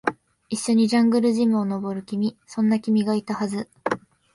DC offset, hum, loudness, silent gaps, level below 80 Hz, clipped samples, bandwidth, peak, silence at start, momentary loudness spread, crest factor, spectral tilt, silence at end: under 0.1%; none; -23 LUFS; none; -66 dBFS; under 0.1%; 11.5 kHz; -4 dBFS; 0.05 s; 10 LU; 18 dB; -5.5 dB/octave; 0.35 s